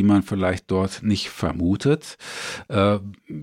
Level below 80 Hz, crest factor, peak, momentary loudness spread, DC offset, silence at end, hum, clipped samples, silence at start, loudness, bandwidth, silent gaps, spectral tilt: -46 dBFS; 16 dB; -6 dBFS; 11 LU; under 0.1%; 0 s; none; under 0.1%; 0 s; -23 LUFS; 15 kHz; none; -6.5 dB/octave